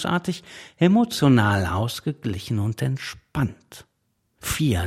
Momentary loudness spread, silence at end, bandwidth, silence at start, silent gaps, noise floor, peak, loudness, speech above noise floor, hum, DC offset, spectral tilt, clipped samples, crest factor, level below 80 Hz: 13 LU; 0 s; 16.5 kHz; 0 s; none; -71 dBFS; -4 dBFS; -23 LUFS; 49 dB; none; under 0.1%; -6 dB/octave; under 0.1%; 20 dB; -48 dBFS